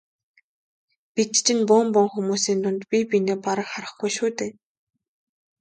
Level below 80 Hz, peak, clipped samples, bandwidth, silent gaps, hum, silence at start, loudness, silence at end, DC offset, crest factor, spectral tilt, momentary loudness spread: -72 dBFS; -4 dBFS; under 0.1%; 9.4 kHz; none; none; 1.15 s; -22 LUFS; 1.1 s; under 0.1%; 20 dB; -3.5 dB/octave; 12 LU